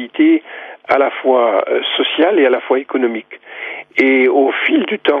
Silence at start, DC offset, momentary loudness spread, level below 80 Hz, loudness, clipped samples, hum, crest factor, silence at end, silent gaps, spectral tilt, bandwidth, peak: 0 s; under 0.1%; 15 LU; -68 dBFS; -14 LUFS; under 0.1%; none; 14 dB; 0 s; none; -5.5 dB/octave; 5.2 kHz; -2 dBFS